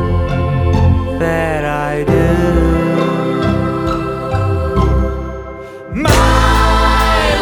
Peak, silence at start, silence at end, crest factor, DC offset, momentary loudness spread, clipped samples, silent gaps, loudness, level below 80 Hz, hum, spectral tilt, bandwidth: 0 dBFS; 0 s; 0 s; 14 dB; under 0.1%; 8 LU; under 0.1%; none; -14 LUFS; -20 dBFS; none; -6 dB/octave; 19.5 kHz